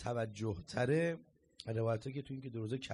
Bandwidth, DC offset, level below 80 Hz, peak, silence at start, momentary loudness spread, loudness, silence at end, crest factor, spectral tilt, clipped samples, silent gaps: 11.5 kHz; under 0.1%; -66 dBFS; -22 dBFS; 0 s; 11 LU; -39 LUFS; 0 s; 16 dB; -6.5 dB/octave; under 0.1%; none